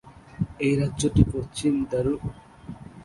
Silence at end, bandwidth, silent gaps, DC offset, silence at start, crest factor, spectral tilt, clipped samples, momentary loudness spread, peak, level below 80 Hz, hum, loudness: 0 s; 11.5 kHz; none; under 0.1%; 0.05 s; 22 dB; -6.5 dB/octave; under 0.1%; 20 LU; -4 dBFS; -38 dBFS; none; -25 LUFS